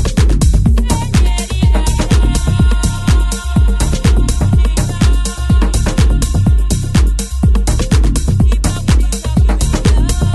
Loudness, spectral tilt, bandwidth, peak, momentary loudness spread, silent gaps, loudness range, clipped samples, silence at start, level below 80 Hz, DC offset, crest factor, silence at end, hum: -13 LUFS; -5.5 dB/octave; 12.5 kHz; 0 dBFS; 2 LU; none; 0 LU; under 0.1%; 0 s; -12 dBFS; under 0.1%; 10 dB; 0 s; none